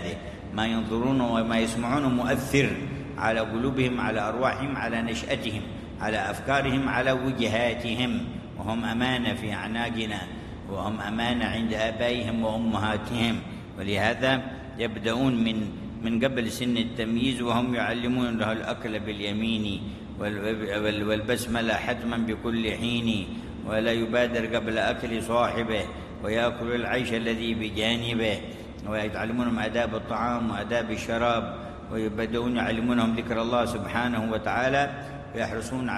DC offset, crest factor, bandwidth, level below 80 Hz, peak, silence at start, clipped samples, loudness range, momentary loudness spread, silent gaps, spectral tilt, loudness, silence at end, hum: under 0.1%; 18 dB; 13 kHz; -46 dBFS; -8 dBFS; 0 s; under 0.1%; 2 LU; 8 LU; none; -5.5 dB/octave; -27 LUFS; 0 s; none